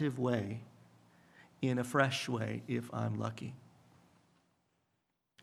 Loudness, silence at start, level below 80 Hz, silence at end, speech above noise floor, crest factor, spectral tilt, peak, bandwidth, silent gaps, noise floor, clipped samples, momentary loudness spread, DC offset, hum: -36 LUFS; 0 s; -78 dBFS; 1.85 s; 47 dB; 26 dB; -6 dB/octave; -12 dBFS; 14.5 kHz; none; -83 dBFS; under 0.1%; 16 LU; under 0.1%; none